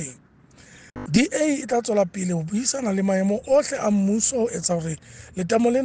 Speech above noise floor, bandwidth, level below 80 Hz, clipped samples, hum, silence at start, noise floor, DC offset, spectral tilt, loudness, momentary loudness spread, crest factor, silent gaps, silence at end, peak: 30 dB; 10 kHz; -54 dBFS; under 0.1%; none; 0 s; -52 dBFS; under 0.1%; -5 dB/octave; -22 LUFS; 12 LU; 18 dB; none; 0 s; -4 dBFS